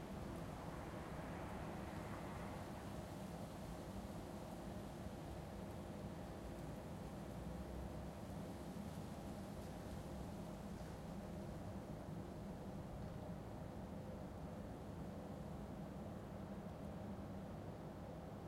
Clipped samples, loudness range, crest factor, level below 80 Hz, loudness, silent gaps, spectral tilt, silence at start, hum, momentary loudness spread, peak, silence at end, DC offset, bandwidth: under 0.1%; 1 LU; 14 dB; -60 dBFS; -51 LUFS; none; -6.5 dB/octave; 0 s; none; 2 LU; -36 dBFS; 0 s; under 0.1%; 16 kHz